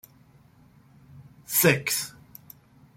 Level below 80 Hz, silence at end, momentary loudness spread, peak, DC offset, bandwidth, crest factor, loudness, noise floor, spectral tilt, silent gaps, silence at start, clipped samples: -64 dBFS; 0.85 s; 27 LU; -6 dBFS; under 0.1%; 16.5 kHz; 24 dB; -23 LUFS; -57 dBFS; -3.5 dB/octave; none; 1.15 s; under 0.1%